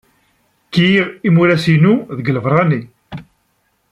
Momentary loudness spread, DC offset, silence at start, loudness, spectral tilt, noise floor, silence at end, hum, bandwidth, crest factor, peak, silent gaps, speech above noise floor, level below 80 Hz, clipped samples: 21 LU; under 0.1%; 0.7 s; -14 LUFS; -7.5 dB/octave; -63 dBFS; 0.7 s; none; 10.5 kHz; 14 dB; -2 dBFS; none; 50 dB; -54 dBFS; under 0.1%